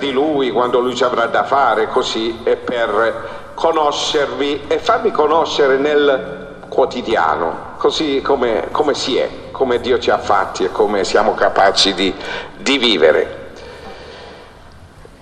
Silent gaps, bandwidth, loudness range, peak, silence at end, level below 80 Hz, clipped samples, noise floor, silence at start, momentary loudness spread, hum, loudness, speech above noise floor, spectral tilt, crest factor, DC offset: none; 10.5 kHz; 3 LU; 0 dBFS; 0.05 s; -44 dBFS; under 0.1%; -39 dBFS; 0 s; 12 LU; none; -16 LUFS; 24 dB; -3.5 dB/octave; 16 dB; under 0.1%